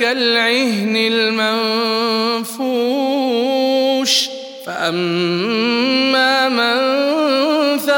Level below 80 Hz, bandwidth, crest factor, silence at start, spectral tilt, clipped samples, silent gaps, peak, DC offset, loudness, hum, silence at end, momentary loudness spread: -72 dBFS; 17.5 kHz; 14 dB; 0 s; -3.5 dB/octave; under 0.1%; none; -2 dBFS; under 0.1%; -15 LUFS; none; 0 s; 5 LU